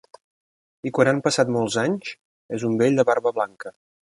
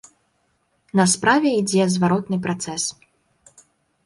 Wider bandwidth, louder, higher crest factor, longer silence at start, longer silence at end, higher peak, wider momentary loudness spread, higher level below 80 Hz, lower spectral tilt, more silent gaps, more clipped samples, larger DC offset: about the same, 11.5 kHz vs 11.5 kHz; about the same, -22 LUFS vs -20 LUFS; about the same, 20 dB vs 18 dB; about the same, 0.85 s vs 0.95 s; second, 0.45 s vs 1.15 s; about the same, -2 dBFS vs -4 dBFS; first, 15 LU vs 9 LU; second, -66 dBFS vs -60 dBFS; about the same, -5 dB/octave vs -4.5 dB/octave; first, 2.25-2.49 s vs none; neither; neither